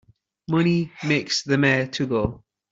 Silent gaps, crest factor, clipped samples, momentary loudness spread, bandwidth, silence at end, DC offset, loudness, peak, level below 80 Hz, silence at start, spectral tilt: none; 18 dB; under 0.1%; 6 LU; 7.8 kHz; 0.35 s; under 0.1%; -22 LUFS; -6 dBFS; -48 dBFS; 0.5 s; -5.5 dB/octave